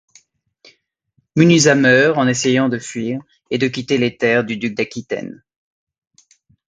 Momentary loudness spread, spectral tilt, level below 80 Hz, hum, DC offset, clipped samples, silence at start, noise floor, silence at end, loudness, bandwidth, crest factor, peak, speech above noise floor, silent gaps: 14 LU; -4.5 dB/octave; -58 dBFS; none; under 0.1%; under 0.1%; 1.35 s; -65 dBFS; 1.35 s; -16 LUFS; 9.6 kHz; 18 dB; 0 dBFS; 49 dB; none